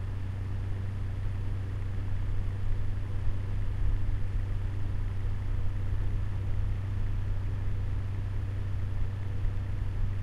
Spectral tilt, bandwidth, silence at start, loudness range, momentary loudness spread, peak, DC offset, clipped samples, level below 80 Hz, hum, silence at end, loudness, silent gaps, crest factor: -8 dB/octave; 5.4 kHz; 0 s; 1 LU; 2 LU; -16 dBFS; under 0.1%; under 0.1%; -32 dBFS; none; 0 s; -35 LUFS; none; 12 dB